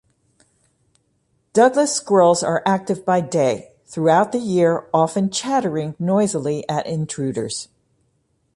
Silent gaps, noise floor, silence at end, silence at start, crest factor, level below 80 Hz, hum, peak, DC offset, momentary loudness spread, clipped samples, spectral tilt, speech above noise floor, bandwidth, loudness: none; -66 dBFS; 0.9 s; 1.55 s; 16 dB; -62 dBFS; none; -4 dBFS; under 0.1%; 10 LU; under 0.1%; -5 dB/octave; 48 dB; 11.5 kHz; -19 LUFS